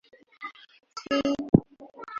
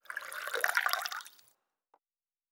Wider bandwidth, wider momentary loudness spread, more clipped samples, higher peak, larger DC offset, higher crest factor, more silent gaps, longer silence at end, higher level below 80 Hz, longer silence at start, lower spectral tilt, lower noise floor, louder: second, 7.6 kHz vs over 20 kHz; first, 20 LU vs 13 LU; neither; first, -2 dBFS vs -10 dBFS; neither; about the same, 26 dB vs 28 dB; first, 1.49-1.53 s vs none; second, 0 s vs 1.2 s; first, -52 dBFS vs under -90 dBFS; first, 0.4 s vs 0.1 s; first, -7 dB/octave vs 3 dB/octave; second, -46 dBFS vs under -90 dBFS; first, -25 LUFS vs -33 LUFS